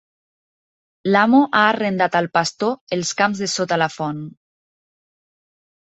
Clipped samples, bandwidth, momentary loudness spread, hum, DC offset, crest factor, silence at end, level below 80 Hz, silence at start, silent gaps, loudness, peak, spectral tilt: under 0.1%; 8.2 kHz; 13 LU; none; under 0.1%; 18 dB; 1.55 s; -64 dBFS; 1.05 s; 2.81-2.87 s; -18 LUFS; -2 dBFS; -4 dB/octave